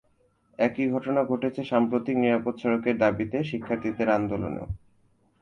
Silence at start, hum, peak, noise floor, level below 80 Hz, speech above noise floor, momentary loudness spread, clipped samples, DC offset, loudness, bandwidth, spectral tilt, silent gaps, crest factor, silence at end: 0.6 s; none; -6 dBFS; -66 dBFS; -52 dBFS; 41 dB; 7 LU; under 0.1%; under 0.1%; -26 LUFS; 6.8 kHz; -8 dB/octave; none; 20 dB; 0.65 s